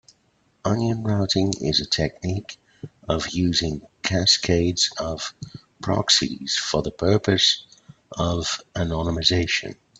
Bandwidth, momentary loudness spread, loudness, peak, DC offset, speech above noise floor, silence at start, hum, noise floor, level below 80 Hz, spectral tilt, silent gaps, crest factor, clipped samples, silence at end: 9.2 kHz; 13 LU; -22 LUFS; -4 dBFS; under 0.1%; 42 dB; 0.65 s; none; -64 dBFS; -46 dBFS; -4 dB/octave; none; 20 dB; under 0.1%; 0.25 s